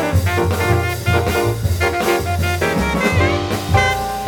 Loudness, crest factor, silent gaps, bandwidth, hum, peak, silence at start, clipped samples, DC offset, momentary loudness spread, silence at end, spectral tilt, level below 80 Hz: -17 LUFS; 16 dB; none; 19 kHz; none; -2 dBFS; 0 s; under 0.1%; under 0.1%; 3 LU; 0 s; -5.5 dB/octave; -30 dBFS